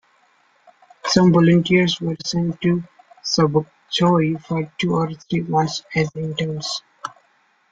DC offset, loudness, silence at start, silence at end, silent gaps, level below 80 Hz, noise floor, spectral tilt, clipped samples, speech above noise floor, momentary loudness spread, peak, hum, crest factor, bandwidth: under 0.1%; -20 LUFS; 1.05 s; 0.65 s; none; -54 dBFS; -61 dBFS; -5.5 dB/octave; under 0.1%; 42 dB; 12 LU; -2 dBFS; none; 18 dB; 7.8 kHz